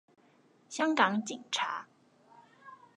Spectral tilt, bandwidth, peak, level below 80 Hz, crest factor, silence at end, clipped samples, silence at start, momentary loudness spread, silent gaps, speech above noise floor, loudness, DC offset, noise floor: -3 dB/octave; 11 kHz; -10 dBFS; -88 dBFS; 24 dB; 0.2 s; under 0.1%; 0.7 s; 16 LU; none; 34 dB; -31 LUFS; under 0.1%; -65 dBFS